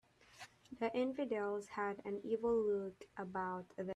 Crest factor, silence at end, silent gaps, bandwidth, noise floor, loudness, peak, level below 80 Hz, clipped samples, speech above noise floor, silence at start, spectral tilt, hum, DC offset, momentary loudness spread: 14 dB; 0 s; none; 11.5 kHz; -60 dBFS; -40 LUFS; -26 dBFS; -74 dBFS; under 0.1%; 20 dB; 0.35 s; -6.5 dB/octave; none; under 0.1%; 17 LU